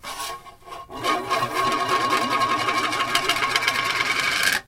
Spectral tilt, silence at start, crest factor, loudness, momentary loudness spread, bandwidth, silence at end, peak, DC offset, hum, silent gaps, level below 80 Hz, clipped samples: -1.5 dB/octave; 0.05 s; 22 dB; -22 LUFS; 12 LU; 16.5 kHz; 0.05 s; -2 dBFS; under 0.1%; none; none; -54 dBFS; under 0.1%